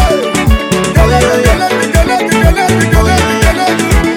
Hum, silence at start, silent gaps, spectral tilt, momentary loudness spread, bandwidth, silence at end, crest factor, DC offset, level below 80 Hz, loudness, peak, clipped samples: none; 0 s; none; -5 dB/octave; 3 LU; 19.5 kHz; 0 s; 8 dB; under 0.1%; -14 dBFS; -10 LUFS; 0 dBFS; 0.8%